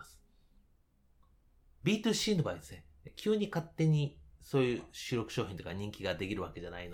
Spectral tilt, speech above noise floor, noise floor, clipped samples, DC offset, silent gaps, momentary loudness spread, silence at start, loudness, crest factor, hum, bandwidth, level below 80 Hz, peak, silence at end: -5.5 dB/octave; 34 dB; -69 dBFS; under 0.1%; under 0.1%; none; 12 LU; 0 s; -35 LUFS; 18 dB; none; 18.5 kHz; -60 dBFS; -18 dBFS; 0 s